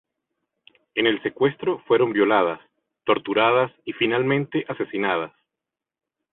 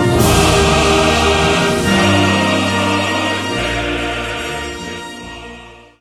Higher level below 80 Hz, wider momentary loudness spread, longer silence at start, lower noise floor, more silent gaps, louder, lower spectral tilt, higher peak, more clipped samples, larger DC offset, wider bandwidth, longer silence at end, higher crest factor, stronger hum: second, -66 dBFS vs -30 dBFS; second, 9 LU vs 16 LU; first, 0.95 s vs 0 s; first, -87 dBFS vs -37 dBFS; neither; second, -22 LUFS vs -14 LUFS; first, -10 dB/octave vs -4 dB/octave; second, -4 dBFS vs 0 dBFS; neither; neither; second, 4.1 kHz vs 18 kHz; first, 1.05 s vs 0.25 s; about the same, 18 dB vs 14 dB; neither